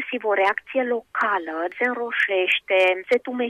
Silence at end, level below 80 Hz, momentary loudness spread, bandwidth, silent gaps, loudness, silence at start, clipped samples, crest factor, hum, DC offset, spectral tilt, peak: 0 s; -70 dBFS; 6 LU; 13 kHz; none; -22 LUFS; 0 s; under 0.1%; 14 dB; none; under 0.1%; -3 dB/octave; -10 dBFS